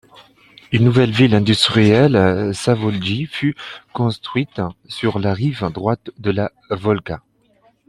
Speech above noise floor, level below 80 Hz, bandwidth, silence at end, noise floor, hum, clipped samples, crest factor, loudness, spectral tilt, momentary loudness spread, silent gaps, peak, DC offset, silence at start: 40 dB; -50 dBFS; 12 kHz; 0.7 s; -57 dBFS; none; under 0.1%; 18 dB; -17 LUFS; -6.5 dB/octave; 11 LU; none; 0 dBFS; under 0.1%; 0.7 s